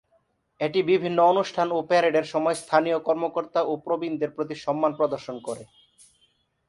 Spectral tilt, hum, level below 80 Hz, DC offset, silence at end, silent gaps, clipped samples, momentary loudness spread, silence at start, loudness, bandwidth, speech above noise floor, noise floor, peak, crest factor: -5.5 dB/octave; none; -70 dBFS; under 0.1%; 1.05 s; none; under 0.1%; 10 LU; 0.6 s; -24 LUFS; 11.5 kHz; 44 dB; -68 dBFS; -4 dBFS; 20 dB